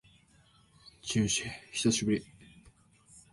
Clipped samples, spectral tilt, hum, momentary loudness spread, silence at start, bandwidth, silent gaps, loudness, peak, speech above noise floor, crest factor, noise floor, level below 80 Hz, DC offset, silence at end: under 0.1%; -3.5 dB/octave; none; 8 LU; 0.85 s; 11.5 kHz; none; -31 LUFS; -16 dBFS; 33 dB; 20 dB; -64 dBFS; -60 dBFS; under 0.1%; 0.15 s